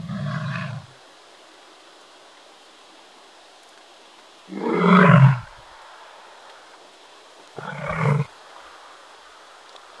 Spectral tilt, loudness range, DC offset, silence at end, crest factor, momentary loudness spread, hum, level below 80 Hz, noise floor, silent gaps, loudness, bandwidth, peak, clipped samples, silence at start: -8 dB/octave; 15 LU; under 0.1%; 1.75 s; 24 dB; 30 LU; none; -60 dBFS; -49 dBFS; none; -19 LUFS; 11 kHz; 0 dBFS; under 0.1%; 0 s